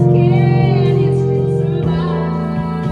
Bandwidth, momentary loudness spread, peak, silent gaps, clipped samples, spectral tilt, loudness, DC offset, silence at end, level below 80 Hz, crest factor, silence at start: 5.2 kHz; 7 LU; -2 dBFS; none; under 0.1%; -10 dB/octave; -15 LUFS; under 0.1%; 0 s; -40 dBFS; 12 dB; 0 s